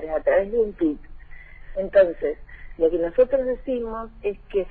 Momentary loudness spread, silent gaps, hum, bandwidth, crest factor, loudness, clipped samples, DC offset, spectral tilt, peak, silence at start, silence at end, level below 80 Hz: 12 LU; none; none; 4.4 kHz; 18 dB; -23 LUFS; under 0.1%; under 0.1%; -9 dB/octave; -6 dBFS; 0 s; 0 s; -42 dBFS